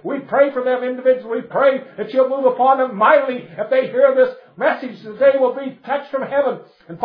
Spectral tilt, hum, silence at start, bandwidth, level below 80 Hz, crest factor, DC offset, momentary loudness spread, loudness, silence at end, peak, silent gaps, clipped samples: -8 dB/octave; none; 0.05 s; 5.2 kHz; -74 dBFS; 16 dB; under 0.1%; 11 LU; -17 LUFS; 0 s; 0 dBFS; none; under 0.1%